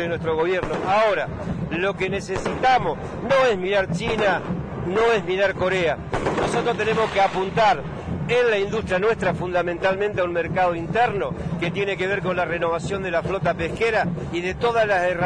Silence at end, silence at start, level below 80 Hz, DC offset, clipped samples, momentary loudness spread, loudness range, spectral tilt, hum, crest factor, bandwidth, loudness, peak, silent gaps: 0 s; 0 s; -44 dBFS; under 0.1%; under 0.1%; 7 LU; 2 LU; -5.5 dB/octave; none; 12 dB; 10.5 kHz; -22 LUFS; -8 dBFS; none